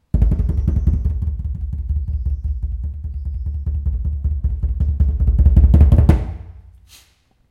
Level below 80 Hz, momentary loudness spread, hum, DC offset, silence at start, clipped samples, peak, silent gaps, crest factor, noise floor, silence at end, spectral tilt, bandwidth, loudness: -18 dBFS; 14 LU; none; under 0.1%; 0.15 s; under 0.1%; 0 dBFS; none; 16 dB; -56 dBFS; 0.9 s; -10 dB/octave; 3.3 kHz; -19 LUFS